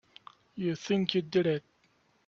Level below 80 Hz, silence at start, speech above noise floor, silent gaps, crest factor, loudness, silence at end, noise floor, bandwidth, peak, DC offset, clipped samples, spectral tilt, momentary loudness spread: -72 dBFS; 0.55 s; 40 dB; none; 22 dB; -31 LUFS; 0.7 s; -69 dBFS; 7.4 kHz; -10 dBFS; under 0.1%; under 0.1%; -6 dB/octave; 8 LU